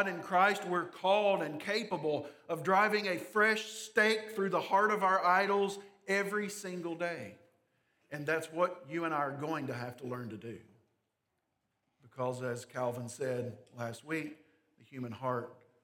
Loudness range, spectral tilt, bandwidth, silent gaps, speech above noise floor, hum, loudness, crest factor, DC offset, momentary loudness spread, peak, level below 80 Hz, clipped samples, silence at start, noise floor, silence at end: 11 LU; -4.5 dB/octave; 18 kHz; none; 50 dB; none; -33 LUFS; 22 dB; under 0.1%; 15 LU; -12 dBFS; -86 dBFS; under 0.1%; 0 s; -83 dBFS; 0.3 s